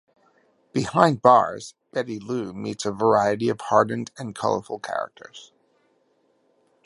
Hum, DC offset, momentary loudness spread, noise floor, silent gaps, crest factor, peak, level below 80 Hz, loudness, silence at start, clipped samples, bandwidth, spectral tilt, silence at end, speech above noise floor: none; under 0.1%; 15 LU; -66 dBFS; none; 24 dB; 0 dBFS; -62 dBFS; -23 LUFS; 0.75 s; under 0.1%; 11.5 kHz; -5.5 dB/octave; 1.45 s; 43 dB